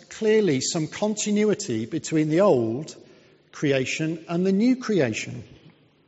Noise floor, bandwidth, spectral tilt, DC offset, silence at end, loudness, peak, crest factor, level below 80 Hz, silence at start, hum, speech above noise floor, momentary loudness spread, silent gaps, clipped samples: -55 dBFS; 8 kHz; -5.5 dB/octave; under 0.1%; 0.6 s; -23 LUFS; -8 dBFS; 16 dB; -64 dBFS; 0.1 s; none; 32 dB; 9 LU; none; under 0.1%